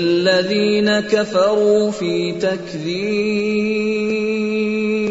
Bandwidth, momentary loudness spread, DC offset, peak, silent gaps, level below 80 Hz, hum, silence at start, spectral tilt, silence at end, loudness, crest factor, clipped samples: 8 kHz; 6 LU; under 0.1%; -4 dBFS; none; -54 dBFS; none; 0 s; -5.5 dB/octave; 0 s; -18 LUFS; 14 dB; under 0.1%